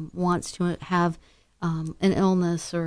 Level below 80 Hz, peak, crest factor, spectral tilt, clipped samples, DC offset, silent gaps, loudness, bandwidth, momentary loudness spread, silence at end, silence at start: -52 dBFS; -10 dBFS; 16 dB; -6.5 dB/octave; under 0.1%; under 0.1%; none; -25 LUFS; 11 kHz; 8 LU; 0 s; 0 s